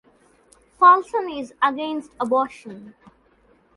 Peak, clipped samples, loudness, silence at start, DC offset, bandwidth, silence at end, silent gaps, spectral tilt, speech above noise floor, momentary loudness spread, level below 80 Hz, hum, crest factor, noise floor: -2 dBFS; under 0.1%; -20 LUFS; 0.8 s; under 0.1%; 11.5 kHz; 0.85 s; none; -4.5 dB/octave; 38 dB; 23 LU; -64 dBFS; none; 20 dB; -58 dBFS